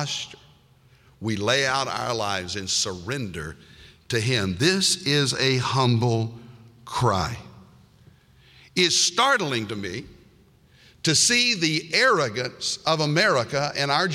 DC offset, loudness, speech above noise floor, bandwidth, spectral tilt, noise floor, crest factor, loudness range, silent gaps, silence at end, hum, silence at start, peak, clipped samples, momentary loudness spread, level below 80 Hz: under 0.1%; -22 LUFS; 33 dB; 16 kHz; -3 dB/octave; -56 dBFS; 18 dB; 5 LU; none; 0 s; none; 0 s; -6 dBFS; under 0.1%; 13 LU; -54 dBFS